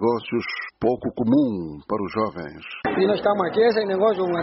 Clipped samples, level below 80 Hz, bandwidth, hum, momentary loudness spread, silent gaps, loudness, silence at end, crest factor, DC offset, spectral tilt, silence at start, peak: under 0.1%; -56 dBFS; 6 kHz; none; 10 LU; none; -22 LUFS; 0 s; 14 dB; under 0.1%; -5 dB/octave; 0 s; -8 dBFS